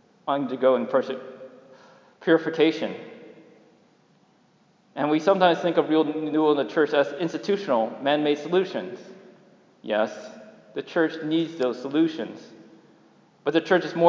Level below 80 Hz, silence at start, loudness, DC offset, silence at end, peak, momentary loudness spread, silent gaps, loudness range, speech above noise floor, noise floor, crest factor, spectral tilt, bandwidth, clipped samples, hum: -88 dBFS; 0.25 s; -24 LUFS; under 0.1%; 0 s; -4 dBFS; 17 LU; none; 5 LU; 38 dB; -61 dBFS; 22 dB; -6 dB/octave; 7.4 kHz; under 0.1%; none